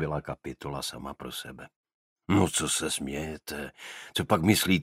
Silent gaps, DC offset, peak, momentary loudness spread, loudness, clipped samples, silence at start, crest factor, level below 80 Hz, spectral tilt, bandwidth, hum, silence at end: 1.76-1.84 s, 1.94-2.16 s; under 0.1%; -6 dBFS; 16 LU; -29 LUFS; under 0.1%; 0 s; 24 dB; -52 dBFS; -4 dB/octave; 16 kHz; none; 0 s